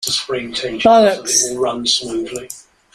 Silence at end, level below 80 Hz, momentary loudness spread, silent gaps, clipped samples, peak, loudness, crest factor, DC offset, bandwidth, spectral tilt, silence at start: 0.35 s; -50 dBFS; 16 LU; none; under 0.1%; -2 dBFS; -15 LUFS; 16 dB; under 0.1%; 15.5 kHz; -2 dB/octave; 0 s